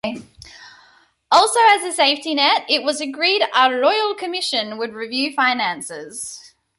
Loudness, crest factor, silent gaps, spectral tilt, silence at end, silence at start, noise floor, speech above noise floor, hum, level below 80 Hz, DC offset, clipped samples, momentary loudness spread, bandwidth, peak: -17 LUFS; 18 dB; none; -1 dB/octave; 0.3 s; 0.05 s; -54 dBFS; 36 dB; none; -64 dBFS; under 0.1%; under 0.1%; 15 LU; 12 kHz; -2 dBFS